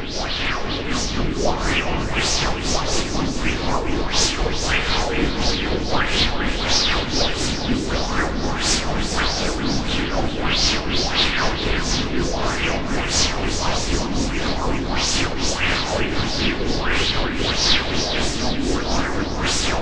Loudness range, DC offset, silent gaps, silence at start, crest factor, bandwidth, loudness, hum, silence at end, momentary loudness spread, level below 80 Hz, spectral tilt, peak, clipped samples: 2 LU; under 0.1%; none; 0 s; 18 dB; 11 kHz; -21 LUFS; none; 0 s; 5 LU; -28 dBFS; -3 dB/octave; -2 dBFS; under 0.1%